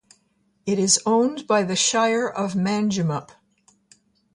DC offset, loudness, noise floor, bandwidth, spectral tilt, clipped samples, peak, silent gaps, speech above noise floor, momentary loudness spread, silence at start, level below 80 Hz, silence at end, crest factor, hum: under 0.1%; -21 LUFS; -66 dBFS; 11.5 kHz; -3.5 dB/octave; under 0.1%; -6 dBFS; none; 45 dB; 9 LU; 0.65 s; -64 dBFS; 1.1 s; 18 dB; none